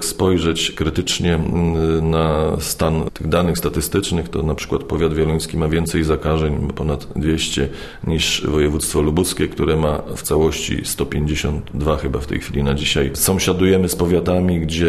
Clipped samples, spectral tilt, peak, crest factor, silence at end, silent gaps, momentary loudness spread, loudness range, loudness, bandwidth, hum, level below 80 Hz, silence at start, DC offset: under 0.1%; -5 dB/octave; -2 dBFS; 16 dB; 0 s; none; 6 LU; 2 LU; -19 LUFS; 13.5 kHz; none; -30 dBFS; 0 s; under 0.1%